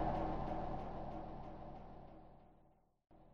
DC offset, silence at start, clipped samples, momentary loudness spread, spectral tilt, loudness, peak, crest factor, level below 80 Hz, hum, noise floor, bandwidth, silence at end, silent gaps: under 0.1%; 0 s; under 0.1%; 19 LU; -7 dB/octave; -46 LUFS; -26 dBFS; 20 dB; -52 dBFS; none; -72 dBFS; 6.6 kHz; 0 s; none